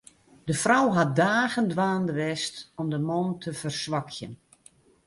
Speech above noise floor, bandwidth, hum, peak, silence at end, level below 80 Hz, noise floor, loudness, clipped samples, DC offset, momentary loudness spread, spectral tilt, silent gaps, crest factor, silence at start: 32 dB; 11.5 kHz; none; -6 dBFS; 0.7 s; -64 dBFS; -58 dBFS; -26 LUFS; under 0.1%; under 0.1%; 12 LU; -5 dB/octave; none; 20 dB; 0.45 s